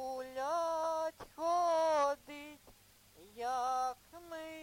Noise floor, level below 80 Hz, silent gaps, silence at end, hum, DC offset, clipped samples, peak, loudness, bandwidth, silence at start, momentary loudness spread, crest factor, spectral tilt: -63 dBFS; -72 dBFS; none; 0 s; none; under 0.1%; under 0.1%; -22 dBFS; -36 LUFS; 16.5 kHz; 0 s; 18 LU; 16 dB; -2.5 dB/octave